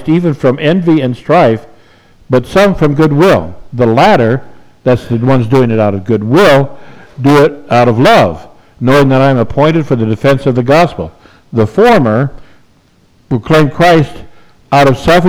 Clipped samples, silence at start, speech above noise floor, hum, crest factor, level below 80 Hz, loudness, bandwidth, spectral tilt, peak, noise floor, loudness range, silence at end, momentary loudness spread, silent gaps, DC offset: under 0.1%; 0 s; 40 dB; none; 10 dB; -36 dBFS; -9 LUFS; over 20 kHz; -7 dB/octave; 0 dBFS; -48 dBFS; 2 LU; 0 s; 10 LU; none; under 0.1%